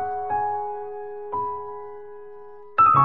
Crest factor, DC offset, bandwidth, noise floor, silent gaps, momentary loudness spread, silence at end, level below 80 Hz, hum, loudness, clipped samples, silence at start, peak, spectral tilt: 18 dB; 0.6%; 4.3 kHz; -43 dBFS; none; 21 LU; 0 s; -58 dBFS; none; -25 LUFS; under 0.1%; 0 s; -6 dBFS; -6 dB/octave